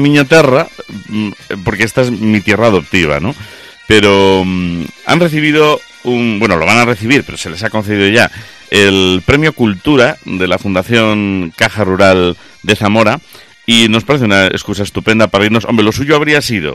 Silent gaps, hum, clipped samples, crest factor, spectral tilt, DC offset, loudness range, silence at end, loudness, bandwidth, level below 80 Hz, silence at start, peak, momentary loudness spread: none; none; 0.2%; 10 dB; -5 dB/octave; under 0.1%; 1 LU; 0 s; -10 LUFS; 15.5 kHz; -38 dBFS; 0 s; 0 dBFS; 11 LU